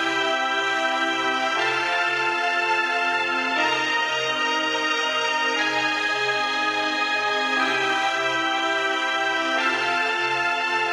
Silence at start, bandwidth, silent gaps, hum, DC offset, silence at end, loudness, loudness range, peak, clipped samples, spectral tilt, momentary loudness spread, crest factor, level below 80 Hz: 0 s; 15 kHz; none; none; under 0.1%; 0 s; -21 LUFS; 0 LU; -10 dBFS; under 0.1%; -1.5 dB/octave; 1 LU; 14 dB; -68 dBFS